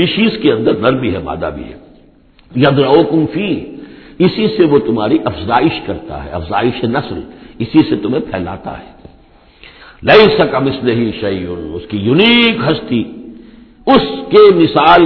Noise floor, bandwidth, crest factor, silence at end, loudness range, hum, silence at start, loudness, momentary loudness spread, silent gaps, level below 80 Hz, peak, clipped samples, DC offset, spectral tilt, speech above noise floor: -45 dBFS; 5.4 kHz; 12 dB; 0 s; 6 LU; none; 0 s; -12 LUFS; 17 LU; none; -40 dBFS; 0 dBFS; 0.3%; under 0.1%; -8.5 dB/octave; 34 dB